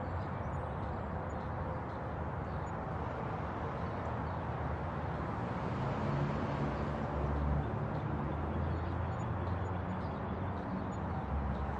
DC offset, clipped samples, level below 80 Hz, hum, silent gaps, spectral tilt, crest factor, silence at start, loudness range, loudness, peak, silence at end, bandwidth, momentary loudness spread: under 0.1%; under 0.1%; -46 dBFS; none; none; -8.5 dB/octave; 14 dB; 0 s; 3 LU; -38 LUFS; -22 dBFS; 0 s; 7.8 kHz; 4 LU